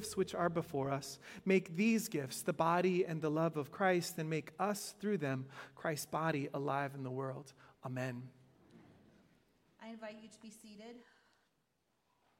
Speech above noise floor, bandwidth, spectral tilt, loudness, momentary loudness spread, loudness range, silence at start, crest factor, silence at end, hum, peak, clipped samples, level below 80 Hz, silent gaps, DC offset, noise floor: 43 dB; 16.5 kHz; -5.5 dB/octave; -37 LUFS; 20 LU; 21 LU; 0 s; 20 dB; 1.35 s; none; -18 dBFS; under 0.1%; -78 dBFS; none; under 0.1%; -81 dBFS